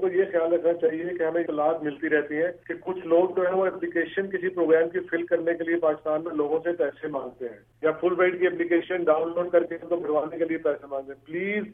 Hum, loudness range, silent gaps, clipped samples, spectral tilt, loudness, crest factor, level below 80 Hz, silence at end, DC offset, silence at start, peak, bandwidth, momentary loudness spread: none; 1 LU; none; under 0.1%; -9 dB/octave; -26 LUFS; 18 dB; -68 dBFS; 0 s; under 0.1%; 0 s; -8 dBFS; 3.7 kHz; 10 LU